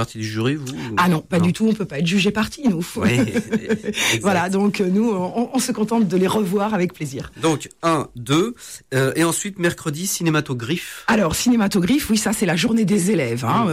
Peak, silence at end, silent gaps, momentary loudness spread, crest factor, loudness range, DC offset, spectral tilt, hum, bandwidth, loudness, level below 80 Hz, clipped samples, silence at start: -8 dBFS; 0 s; none; 6 LU; 12 dB; 2 LU; 0.1%; -5 dB/octave; none; 16 kHz; -20 LUFS; -48 dBFS; under 0.1%; 0 s